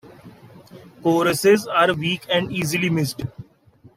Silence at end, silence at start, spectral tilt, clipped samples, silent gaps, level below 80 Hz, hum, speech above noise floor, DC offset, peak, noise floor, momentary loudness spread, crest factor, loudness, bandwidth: 0.55 s; 0.05 s; -5 dB/octave; under 0.1%; none; -58 dBFS; none; 32 dB; under 0.1%; -4 dBFS; -52 dBFS; 9 LU; 18 dB; -20 LUFS; 16 kHz